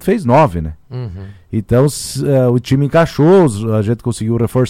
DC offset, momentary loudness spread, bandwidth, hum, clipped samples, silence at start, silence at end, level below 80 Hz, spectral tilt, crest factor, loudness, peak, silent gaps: under 0.1%; 16 LU; 16 kHz; none; under 0.1%; 0 s; 0 s; -36 dBFS; -7 dB/octave; 12 dB; -13 LUFS; -2 dBFS; none